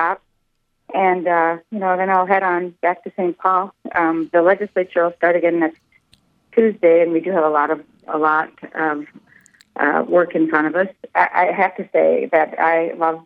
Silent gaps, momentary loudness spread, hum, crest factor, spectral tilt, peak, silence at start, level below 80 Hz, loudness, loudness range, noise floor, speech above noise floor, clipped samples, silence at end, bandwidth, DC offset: none; 7 LU; none; 18 dB; -8 dB/octave; 0 dBFS; 0 s; -70 dBFS; -18 LUFS; 2 LU; -67 dBFS; 50 dB; under 0.1%; 0.05 s; 5 kHz; under 0.1%